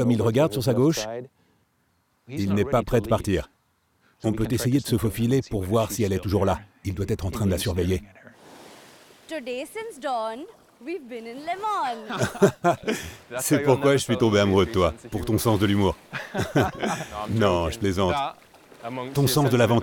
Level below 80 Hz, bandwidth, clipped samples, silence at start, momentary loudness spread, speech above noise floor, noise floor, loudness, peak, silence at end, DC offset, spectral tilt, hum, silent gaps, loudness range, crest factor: -46 dBFS; 20 kHz; under 0.1%; 0 s; 14 LU; 44 dB; -68 dBFS; -24 LUFS; -4 dBFS; 0 s; under 0.1%; -5.5 dB/octave; none; none; 8 LU; 20 dB